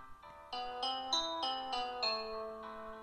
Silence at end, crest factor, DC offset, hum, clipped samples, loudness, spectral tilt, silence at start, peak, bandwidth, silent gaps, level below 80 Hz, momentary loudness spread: 0 s; 18 dB; under 0.1%; none; under 0.1%; -38 LUFS; -1 dB/octave; 0 s; -22 dBFS; 13 kHz; none; -64 dBFS; 13 LU